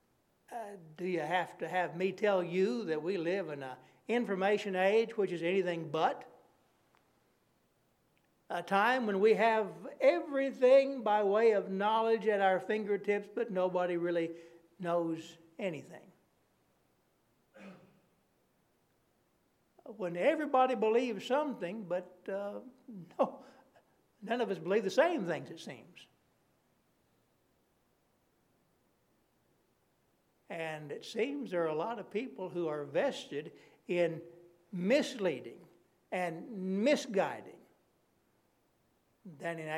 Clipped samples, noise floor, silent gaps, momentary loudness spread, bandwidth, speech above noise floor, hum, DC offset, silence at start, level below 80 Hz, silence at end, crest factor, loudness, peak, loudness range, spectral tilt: under 0.1%; -74 dBFS; none; 16 LU; 13.5 kHz; 42 dB; none; under 0.1%; 0.5 s; -88 dBFS; 0 s; 20 dB; -33 LUFS; -14 dBFS; 11 LU; -5.5 dB/octave